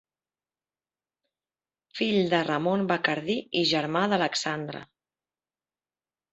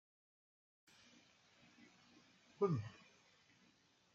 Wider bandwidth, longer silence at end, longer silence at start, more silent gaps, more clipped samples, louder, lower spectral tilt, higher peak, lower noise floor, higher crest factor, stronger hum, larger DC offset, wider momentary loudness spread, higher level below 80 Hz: about the same, 8.2 kHz vs 7.6 kHz; first, 1.5 s vs 1.2 s; second, 1.95 s vs 2.6 s; neither; neither; first, -26 LUFS vs -42 LUFS; second, -4.5 dB/octave vs -7.5 dB/octave; first, -6 dBFS vs -24 dBFS; first, under -90 dBFS vs -74 dBFS; about the same, 24 dB vs 24 dB; neither; neither; second, 9 LU vs 28 LU; first, -70 dBFS vs -86 dBFS